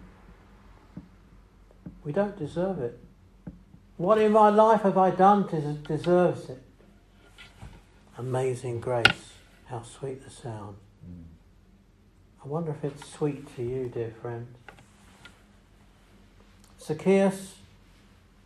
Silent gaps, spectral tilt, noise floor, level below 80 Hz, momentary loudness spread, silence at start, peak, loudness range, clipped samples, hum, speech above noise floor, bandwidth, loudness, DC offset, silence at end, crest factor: none; -6 dB/octave; -58 dBFS; -58 dBFS; 27 LU; 0 s; 0 dBFS; 16 LU; under 0.1%; none; 32 dB; 13 kHz; -26 LUFS; under 0.1%; 0.9 s; 28 dB